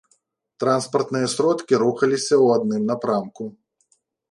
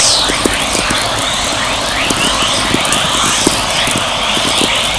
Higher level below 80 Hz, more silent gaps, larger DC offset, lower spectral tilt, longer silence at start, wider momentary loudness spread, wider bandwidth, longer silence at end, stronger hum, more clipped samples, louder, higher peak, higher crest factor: second, -70 dBFS vs -32 dBFS; neither; second, under 0.1% vs 0.5%; first, -5 dB/octave vs -1.5 dB/octave; first, 0.6 s vs 0 s; first, 9 LU vs 3 LU; about the same, 11.5 kHz vs 11 kHz; first, 0.8 s vs 0 s; neither; neither; second, -20 LUFS vs -11 LUFS; second, -4 dBFS vs 0 dBFS; about the same, 18 dB vs 14 dB